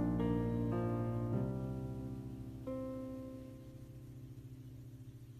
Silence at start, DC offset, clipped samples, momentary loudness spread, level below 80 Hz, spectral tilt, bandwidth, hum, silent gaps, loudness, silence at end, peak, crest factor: 0 s; under 0.1%; under 0.1%; 17 LU; -54 dBFS; -9.5 dB/octave; 14 kHz; none; none; -40 LUFS; 0 s; -24 dBFS; 16 dB